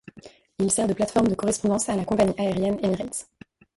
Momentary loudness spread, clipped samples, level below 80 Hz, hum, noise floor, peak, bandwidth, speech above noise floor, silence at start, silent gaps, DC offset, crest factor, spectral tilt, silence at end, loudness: 7 LU; under 0.1%; -52 dBFS; none; -49 dBFS; -8 dBFS; 11.5 kHz; 26 dB; 0.15 s; none; under 0.1%; 18 dB; -5 dB/octave; 0.55 s; -24 LUFS